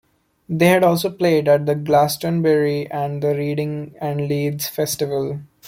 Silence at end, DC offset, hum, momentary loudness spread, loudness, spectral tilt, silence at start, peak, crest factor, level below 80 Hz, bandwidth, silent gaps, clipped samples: 0 s; under 0.1%; none; 9 LU; -19 LUFS; -5.5 dB/octave; 0.5 s; -2 dBFS; 16 dB; -58 dBFS; 16.5 kHz; none; under 0.1%